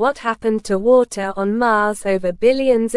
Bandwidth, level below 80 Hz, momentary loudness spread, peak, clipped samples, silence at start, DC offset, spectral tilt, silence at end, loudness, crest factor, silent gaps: 12 kHz; -48 dBFS; 6 LU; -2 dBFS; under 0.1%; 0 s; under 0.1%; -5 dB/octave; 0 s; -17 LUFS; 14 dB; none